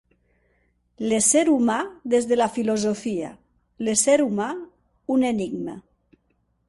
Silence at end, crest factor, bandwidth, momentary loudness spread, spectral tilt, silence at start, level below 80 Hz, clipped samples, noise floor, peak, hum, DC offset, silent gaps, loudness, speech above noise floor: 0.9 s; 18 dB; 11.5 kHz; 15 LU; -3.5 dB/octave; 1 s; -62 dBFS; under 0.1%; -69 dBFS; -6 dBFS; 60 Hz at -60 dBFS; under 0.1%; none; -22 LUFS; 47 dB